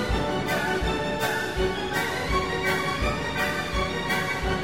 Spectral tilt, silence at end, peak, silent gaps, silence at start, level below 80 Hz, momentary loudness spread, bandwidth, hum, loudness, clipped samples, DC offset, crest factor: -4.5 dB/octave; 0 s; -12 dBFS; none; 0 s; -36 dBFS; 2 LU; 16.5 kHz; none; -26 LUFS; under 0.1%; 0.5%; 14 dB